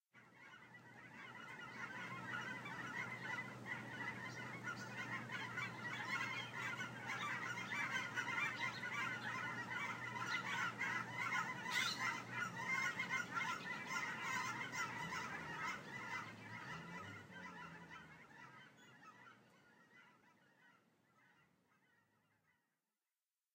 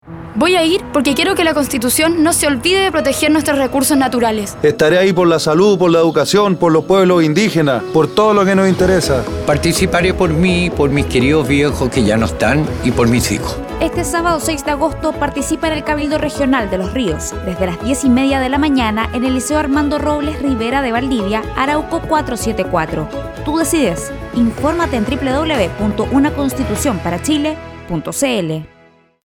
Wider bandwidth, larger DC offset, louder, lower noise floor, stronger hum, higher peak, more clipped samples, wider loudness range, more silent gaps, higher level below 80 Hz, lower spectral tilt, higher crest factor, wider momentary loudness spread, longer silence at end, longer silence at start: second, 16 kHz vs 18.5 kHz; neither; second, -44 LUFS vs -14 LUFS; first, under -90 dBFS vs -48 dBFS; neither; second, -28 dBFS vs 0 dBFS; neither; first, 13 LU vs 5 LU; neither; second, -84 dBFS vs -32 dBFS; second, -3 dB/octave vs -5 dB/octave; first, 20 dB vs 14 dB; first, 18 LU vs 7 LU; first, 2.2 s vs 0.6 s; about the same, 0.15 s vs 0.05 s